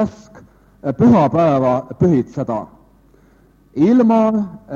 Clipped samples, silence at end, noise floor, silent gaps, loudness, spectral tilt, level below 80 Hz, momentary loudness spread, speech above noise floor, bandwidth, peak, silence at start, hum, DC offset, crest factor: under 0.1%; 0 s; -51 dBFS; none; -15 LUFS; -9.5 dB/octave; -48 dBFS; 13 LU; 36 dB; 7.2 kHz; -2 dBFS; 0 s; none; under 0.1%; 16 dB